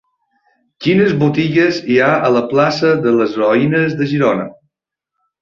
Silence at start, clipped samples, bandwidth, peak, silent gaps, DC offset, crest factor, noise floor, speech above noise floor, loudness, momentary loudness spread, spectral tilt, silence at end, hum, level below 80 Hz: 0.8 s; under 0.1%; 7.4 kHz; -2 dBFS; none; under 0.1%; 14 dB; -80 dBFS; 67 dB; -14 LUFS; 4 LU; -7 dB/octave; 0.9 s; none; -54 dBFS